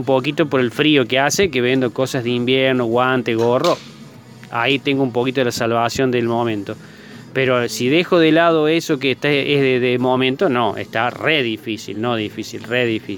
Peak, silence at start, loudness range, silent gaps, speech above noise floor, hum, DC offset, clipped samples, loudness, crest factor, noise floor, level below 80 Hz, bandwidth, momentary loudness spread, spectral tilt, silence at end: 0 dBFS; 0 s; 3 LU; none; 22 dB; none; under 0.1%; under 0.1%; -17 LUFS; 18 dB; -39 dBFS; -56 dBFS; 19 kHz; 8 LU; -5 dB/octave; 0 s